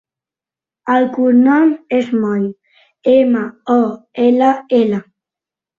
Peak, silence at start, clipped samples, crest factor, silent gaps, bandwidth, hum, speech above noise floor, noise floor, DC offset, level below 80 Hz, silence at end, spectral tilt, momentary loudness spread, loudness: -2 dBFS; 0.85 s; under 0.1%; 14 dB; none; 7 kHz; none; 76 dB; -89 dBFS; under 0.1%; -62 dBFS; 0.75 s; -8 dB/octave; 9 LU; -14 LUFS